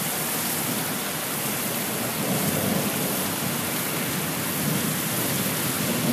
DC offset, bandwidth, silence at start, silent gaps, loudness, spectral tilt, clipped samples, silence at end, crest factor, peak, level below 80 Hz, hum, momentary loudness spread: under 0.1%; 15.5 kHz; 0 s; none; -24 LUFS; -3 dB/octave; under 0.1%; 0 s; 14 dB; -12 dBFS; -60 dBFS; none; 2 LU